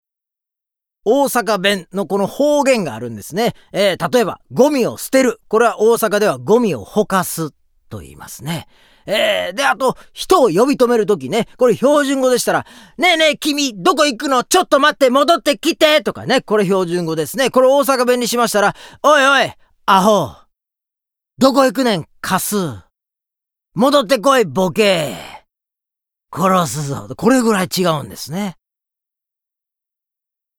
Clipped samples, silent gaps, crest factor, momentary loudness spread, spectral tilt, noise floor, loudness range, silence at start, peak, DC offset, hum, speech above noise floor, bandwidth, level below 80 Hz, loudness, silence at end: under 0.1%; none; 16 dB; 12 LU; -4 dB/octave; -86 dBFS; 5 LU; 1.05 s; 0 dBFS; under 0.1%; none; 71 dB; over 20 kHz; -54 dBFS; -15 LUFS; 2.05 s